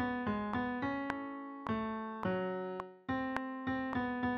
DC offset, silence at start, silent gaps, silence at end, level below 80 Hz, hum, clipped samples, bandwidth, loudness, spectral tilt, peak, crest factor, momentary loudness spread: under 0.1%; 0 s; none; 0 s; -62 dBFS; none; under 0.1%; 6.6 kHz; -38 LUFS; -5 dB/octave; -16 dBFS; 22 dB; 5 LU